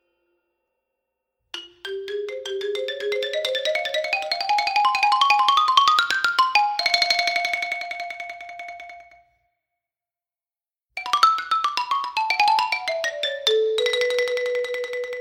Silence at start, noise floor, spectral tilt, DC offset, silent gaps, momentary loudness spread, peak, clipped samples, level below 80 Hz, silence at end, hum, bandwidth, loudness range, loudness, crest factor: 1.55 s; under -90 dBFS; 0.5 dB/octave; under 0.1%; none; 17 LU; -2 dBFS; under 0.1%; -74 dBFS; 0 s; none; 18 kHz; 12 LU; -21 LUFS; 22 dB